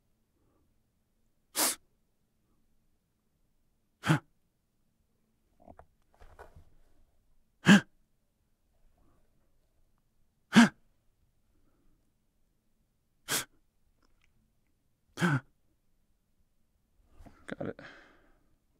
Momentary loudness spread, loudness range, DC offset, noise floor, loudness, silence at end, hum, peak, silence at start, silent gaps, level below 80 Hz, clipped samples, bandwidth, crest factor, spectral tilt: 20 LU; 11 LU; under 0.1%; -75 dBFS; -28 LUFS; 0.95 s; none; -8 dBFS; 1.55 s; none; -68 dBFS; under 0.1%; 16 kHz; 28 dB; -4 dB/octave